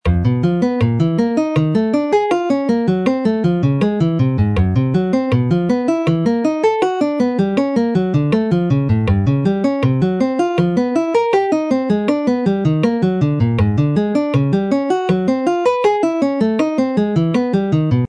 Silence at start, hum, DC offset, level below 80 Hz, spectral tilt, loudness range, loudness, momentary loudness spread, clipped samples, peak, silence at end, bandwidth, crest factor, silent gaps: 0.05 s; none; under 0.1%; -38 dBFS; -8.5 dB/octave; 0 LU; -16 LUFS; 1 LU; under 0.1%; -2 dBFS; 0 s; 10.5 kHz; 14 dB; none